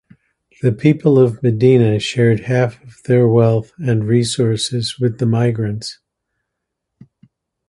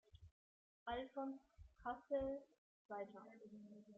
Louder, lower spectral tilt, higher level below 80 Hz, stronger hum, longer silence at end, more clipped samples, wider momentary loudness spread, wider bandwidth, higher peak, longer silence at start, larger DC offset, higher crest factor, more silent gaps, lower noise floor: first, -15 LUFS vs -50 LUFS; first, -6.5 dB/octave vs -4 dB/octave; first, -50 dBFS vs -70 dBFS; neither; first, 1.75 s vs 0 s; neither; second, 9 LU vs 16 LU; first, 11.5 kHz vs 7.6 kHz; first, 0 dBFS vs -32 dBFS; first, 0.65 s vs 0.15 s; neither; about the same, 16 dB vs 18 dB; second, none vs 0.31-0.86 s, 2.58-2.89 s; second, -77 dBFS vs under -90 dBFS